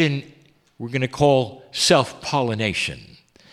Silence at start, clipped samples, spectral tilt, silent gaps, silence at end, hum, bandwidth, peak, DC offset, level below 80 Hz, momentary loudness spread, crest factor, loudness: 0 s; under 0.1%; -4.5 dB/octave; none; 0.5 s; none; 14.5 kHz; -2 dBFS; under 0.1%; -52 dBFS; 12 LU; 20 dB; -21 LUFS